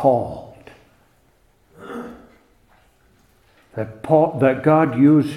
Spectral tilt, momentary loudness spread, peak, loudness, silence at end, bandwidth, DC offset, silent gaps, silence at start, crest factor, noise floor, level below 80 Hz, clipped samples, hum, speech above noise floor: -9 dB/octave; 21 LU; -2 dBFS; -18 LUFS; 0 s; 11 kHz; under 0.1%; none; 0 s; 18 dB; -59 dBFS; -56 dBFS; under 0.1%; none; 42 dB